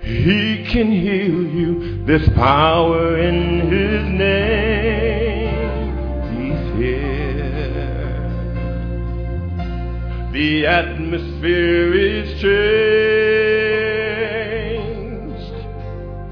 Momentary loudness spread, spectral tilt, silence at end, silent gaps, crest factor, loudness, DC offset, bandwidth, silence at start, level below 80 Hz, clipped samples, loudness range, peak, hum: 11 LU; -8.5 dB/octave; 0 s; none; 16 dB; -18 LUFS; under 0.1%; 5.4 kHz; 0 s; -26 dBFS; under 0.1%; 7 LU; -2 dBFS; none